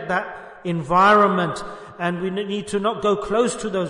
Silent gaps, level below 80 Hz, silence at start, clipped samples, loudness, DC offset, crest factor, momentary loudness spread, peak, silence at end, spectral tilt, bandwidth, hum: none; -52 dBFS; 0 s; under 0.1%; -20 LUFS; under 0.1%; 16 dB; 16 LU; -4 dBFS; 0 s; -5 dB/octave; 11 kHz; none